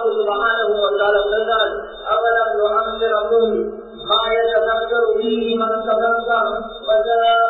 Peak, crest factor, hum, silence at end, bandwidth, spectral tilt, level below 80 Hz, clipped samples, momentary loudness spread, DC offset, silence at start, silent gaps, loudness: -4 dBFS; 14 dB; none; 0 s; 4.4 kHz; -6 dB/octave; -48 dBFS; under 0.1%; 5 LU; under 0.1%; 0 s; none; -18 LUFS